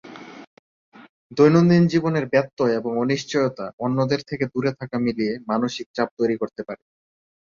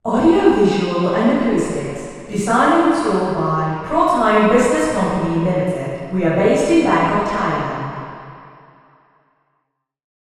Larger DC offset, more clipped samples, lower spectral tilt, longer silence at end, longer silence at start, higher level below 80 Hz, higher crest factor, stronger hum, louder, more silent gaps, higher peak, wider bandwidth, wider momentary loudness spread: neither; neither; about the same, -7 dB/octave vs -6 dB/octave; second, 0.65 s vs 1.85 s; about the same, 0.05 s vs 0.05 s; second, -60 dBFS vs -44 dBFS; about the same, 18 dB vs 18 dB; neither; second, -22 LUFS vs -17 LUFS; first, 0.47-0.92 s, 1.09-1.30 s, 2.53-2.57 s, 3.73-3.78 s, 5.86-5.94 s, 6.11-6.17 s vs none; second, -4 dBFS vs 0 dBFS; second, 7.4 kHz vs 12 kHz; first, 16 LU vs 12 LU